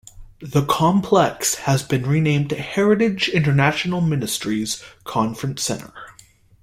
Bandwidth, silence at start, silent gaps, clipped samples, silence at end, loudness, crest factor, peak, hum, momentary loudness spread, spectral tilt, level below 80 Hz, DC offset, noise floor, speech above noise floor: 16.5 kHz; 0.15 s; none; under 0.1%; 0.5 s; -20 LUFS; 18 dB; -2 dBFS; none; 10 LU; -5 dB/octave; -50 dBFS; under 0.1%; -51 dBFS; 31 dB